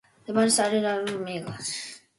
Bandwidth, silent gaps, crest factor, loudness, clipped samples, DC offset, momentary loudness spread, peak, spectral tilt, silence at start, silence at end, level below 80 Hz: 12 kHz; none; 18 dB; -26 LUFS; under 0.1%; under 0.1%; 12 LU; -10 dBFS; -3 dB/octave; 0.3 s; 0.2 s; -70 dBFS